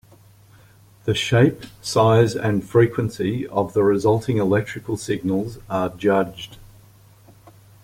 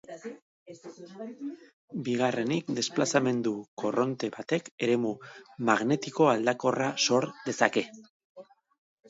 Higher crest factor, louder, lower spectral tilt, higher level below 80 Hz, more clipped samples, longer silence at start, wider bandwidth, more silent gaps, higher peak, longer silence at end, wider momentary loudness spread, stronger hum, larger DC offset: second, 18 dB vs 24 dB; first, -20 LUFS vs -28 LUFS; first, -6.5 dB/octave vs -4.5 dB/octave; first, -52 dBFS vs -76 dBFS; neither; first, 1.05 s vs 0.1 s; first, 16 kHz vs 8 kHz; second, none vs 0.42-0.66 s, 1.73-1.88 s, 3.68-3.77 s, 4.71-4.78 s, 8.10-8.35 s; about the same, -4 dBFS vs -6 dBFS; first, 1.15 s vs 0.65 s; second, 11 LU vs 18 LU; neither; neither